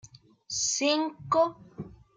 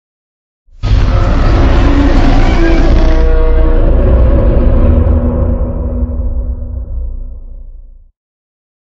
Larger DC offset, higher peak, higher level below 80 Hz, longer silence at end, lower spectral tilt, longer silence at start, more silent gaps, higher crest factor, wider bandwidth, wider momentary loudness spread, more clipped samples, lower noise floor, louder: neither; second, -14 dBFS vs 0 dBFS; second, -64 dBFS vs -10 dBFS; second, 0.25 s vs 0.95 s; second, -2.5 dB/octave vs -8 dB/octave; second, 0.05 s vs 0.85 s; neither; first, 18 dB vs 10 dB; first, 10 kHz vs 6.6 kHz; first, 19 LU vs 12 LU; neither; first, -48 dBFS vs -31 dBFS; second, -27 LUFS vs -12 LUFS